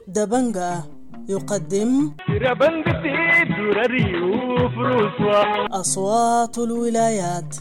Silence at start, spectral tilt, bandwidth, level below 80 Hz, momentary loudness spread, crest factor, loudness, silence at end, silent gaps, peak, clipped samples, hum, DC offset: 0 s; -5 dB/octave; 16.5 kHz; -46 dBFS; 8 LU; 12 dB; -20 LUFS; 0 s; none; -8 dBFS; under 0.1%; none; under 0.1%